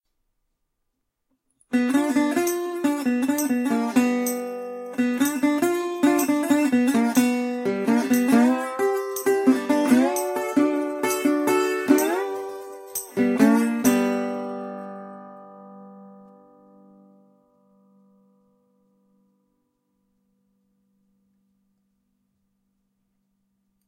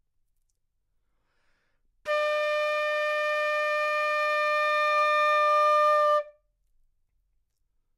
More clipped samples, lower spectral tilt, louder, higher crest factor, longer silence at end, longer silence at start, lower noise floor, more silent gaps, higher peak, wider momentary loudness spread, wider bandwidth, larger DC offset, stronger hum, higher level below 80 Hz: neither; first, -4.5 dB/octave vs 1.5 dB/octave; about the same, -22 LUFS vs -24 LUFS; first, 20 dB vs 12 dB; first, 7.75 s vs 1.65 s; second, 1.7 s vs 2.05 s; about the same, -77 dBFS vs -75 dBFS; neither; first, -4 dBFS vs -14 dBFS; first, 13 LU vs 5 LU; first, 16 kHz vs 13 kHz; neither; neither; about the same, -74 dBFS vs -74 dBFS